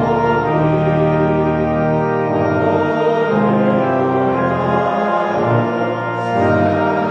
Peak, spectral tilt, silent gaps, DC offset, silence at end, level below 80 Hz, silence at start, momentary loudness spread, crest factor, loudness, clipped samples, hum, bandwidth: -2 dBFS; -9 dB/octave; none; under 0.1%; 0 s; -42 dBFS; 0 s; 2 LU; 12 dB; -16 LUFS; under 0.1%; none; 7.4 kHz